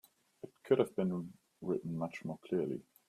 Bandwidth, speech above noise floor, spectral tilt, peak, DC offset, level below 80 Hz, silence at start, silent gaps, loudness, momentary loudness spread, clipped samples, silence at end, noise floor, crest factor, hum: 14.5 kHz; 19 dB; -8 dB/octave; -16 dBFS; under 0.1%; -76 dBFS; 0.45 s; none; -37 LUFS; 20 LU; under 0.1%; 0.3 s; -55 dBFS; 22 dB; none